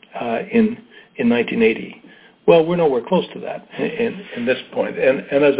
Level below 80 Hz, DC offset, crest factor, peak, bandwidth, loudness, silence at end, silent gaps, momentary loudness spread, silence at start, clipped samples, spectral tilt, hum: -58 dBFS; under 0.1%; 18 dB; 0 dBFS; 4 kHz; -19 LUFS; 0 s; none; 14 LU; 0.15 s; under 0.1%; -10.5 dB/octave; none